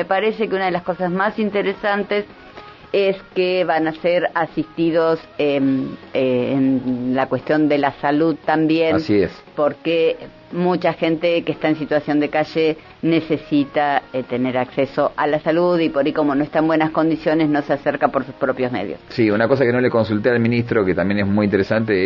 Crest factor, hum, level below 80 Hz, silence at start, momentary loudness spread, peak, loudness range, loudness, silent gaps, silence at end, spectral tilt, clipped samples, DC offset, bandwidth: 18 dB; none; -54 dBFS; 0 s; 5 LU; 0 dBFS; 2 LU; -19 LUFS; none; 0 s; -8.5 dB/octave; under 0.1%; under 0.1%; 6 kHz